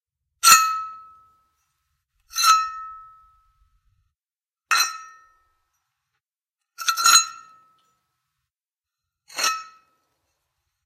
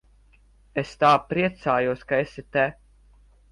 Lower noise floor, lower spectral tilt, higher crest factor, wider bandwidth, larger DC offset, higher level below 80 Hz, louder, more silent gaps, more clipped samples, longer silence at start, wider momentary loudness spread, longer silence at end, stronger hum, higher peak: first, under -90 dBFS vs -56 dBFS; second, 3.5 dB/octave vs -6.5 dB/octave; first, 24 dB vs 18 dB; first, 16 kHz vs 11.5 kHz; neither; second, -70 dBFS vs -54 dBFS; first, -18 LUFS vs -24 LUFS; neither; neither; second, 0.45 s vs 0.75 s; first, 22 LU vs 11 LU; first, 1.2 s vs 0.8 s; second, none vs 50 Hz at -50 dBFS; first, -2 dBFS vs -6 dBFS